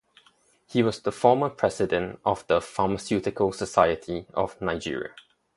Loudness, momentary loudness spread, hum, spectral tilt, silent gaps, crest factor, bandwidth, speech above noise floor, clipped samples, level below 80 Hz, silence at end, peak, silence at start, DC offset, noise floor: -26 LUFS; 9 LU; none; -5.5 dB/octave; none; 22 dB; 11.5 kHz; 37 dB; under 0.1%; -52 dBFS; 0.35 s; -4 dBFS; 0.7 s; under 0.1%; -62 dBFS